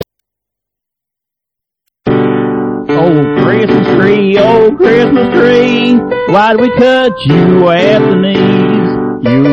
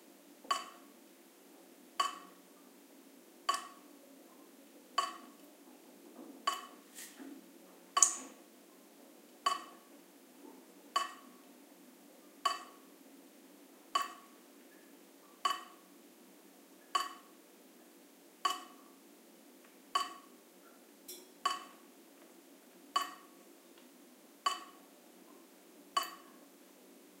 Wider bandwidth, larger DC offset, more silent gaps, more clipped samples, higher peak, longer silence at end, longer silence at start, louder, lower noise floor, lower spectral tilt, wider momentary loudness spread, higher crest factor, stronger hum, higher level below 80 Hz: second, 8.6 kHz vs 16 kHz; neither; neither; first, 0.6% vs under 0.1%; first, 0 dBFS vs -6 dBFS; about the same, 0 s vs 0.1 s; second, 0 s vs 0.3 s; first, -8 LUFS vs -38 LUFS; first, -81 dBFS vs -61 dBFS; first, -8 dB/octave vs 1 dB/octave; second, 6 LU vs 21 LU; second, 8 dB vs 38 dB; neither; first, -40 dBFS vs under -90 dBFS